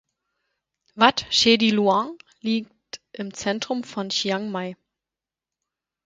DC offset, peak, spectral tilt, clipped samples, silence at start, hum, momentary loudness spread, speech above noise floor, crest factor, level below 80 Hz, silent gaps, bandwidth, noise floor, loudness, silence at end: under 0.1%; 0 dBFS; -3.5 dB/octave; under 0.1%; 0.95 s; none; 17 LU; 67 dB; 24 dB; -62 dBFS; none; 9.4 kHz; -89 dBFS; -22 LUFS; 1.35 s